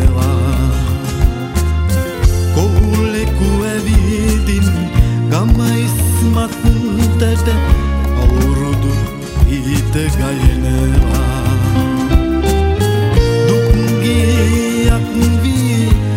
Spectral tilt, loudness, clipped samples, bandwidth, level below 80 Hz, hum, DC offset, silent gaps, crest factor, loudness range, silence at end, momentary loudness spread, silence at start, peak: -6.5 dB/octave; -14 LUFS; under 0.1%; 16.5 kHz; -16 dBFS; none; under 0.1%; none; 12 dB; 2 LU; 0 s; 3 LU; 0 s; 0 dBFS